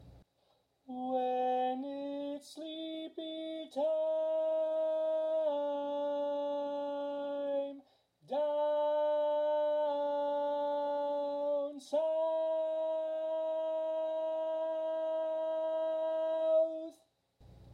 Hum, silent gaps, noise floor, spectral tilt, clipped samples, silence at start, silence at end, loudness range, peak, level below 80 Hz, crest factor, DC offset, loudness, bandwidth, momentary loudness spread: none; none; -74 dBFS; -5 dB/octave; under 0.1%; 0 s; 0 s; 3 LU; -22 dBFS; -76 dBFS; 12 dB; under 0.1%; -35 LUFS; 9.8 kHz; 10 LU